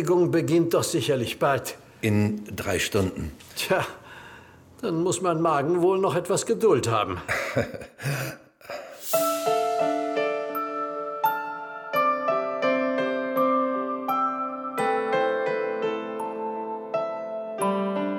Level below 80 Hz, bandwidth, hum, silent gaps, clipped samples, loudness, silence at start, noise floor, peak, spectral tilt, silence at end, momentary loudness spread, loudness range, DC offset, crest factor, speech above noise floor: -56 dBFS; 19 kHz; none; none; under 0.1%; -26 LUFS; 0 s; -49 dBFS; -10 dBFS; -5 dB/octave; 0 s; 12 LU; 3 LU; under 0.1%; 16 dB; 25 dB